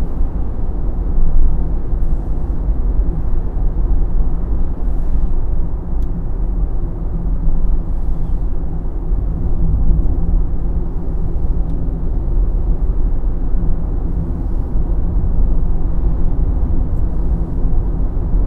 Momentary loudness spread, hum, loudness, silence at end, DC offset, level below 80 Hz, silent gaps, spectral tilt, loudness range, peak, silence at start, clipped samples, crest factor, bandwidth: 4 LU; none; -21 LUFS; 0 s; under 0.1%; -14 dBFS; none; -11.5 dB/octave; 2 LU; 0 dBFS; 0 s; under 0.1%; 14 dB; 1.7 kHz